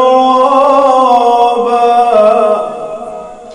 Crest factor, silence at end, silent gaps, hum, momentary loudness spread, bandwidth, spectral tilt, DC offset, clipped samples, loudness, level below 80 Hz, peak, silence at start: 8 dB; 0 s; none; none; 15 LU; 11 kHz; -4.5 dB/octave; under 0.1%; 0.8%; -8 LUFS; -52 dBFS; 0 dBFS; 0 s